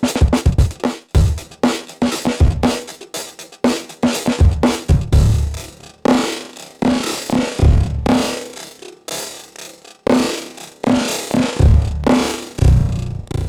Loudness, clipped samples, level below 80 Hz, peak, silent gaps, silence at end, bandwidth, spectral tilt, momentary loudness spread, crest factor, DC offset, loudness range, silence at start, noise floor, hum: -17 LUFS; under 0.1%; -22 dBFS; -2 dBFS; none; 0 s; 16 kHz; -6 dB/octave; 15 LU; 14 dB; under 0.1%; 3 LU; 0 s; -37 dBFS; none